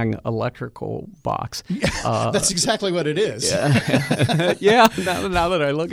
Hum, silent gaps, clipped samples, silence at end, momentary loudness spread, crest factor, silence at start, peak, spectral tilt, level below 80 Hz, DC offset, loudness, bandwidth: none; none; under 0.1%; 0 s; 12 LU; 20 dB; 0 s; 0 dBFS; -4.5 dB/octave; -44 dBFS; under 0.1%; -20 LUFS; over 20 kHz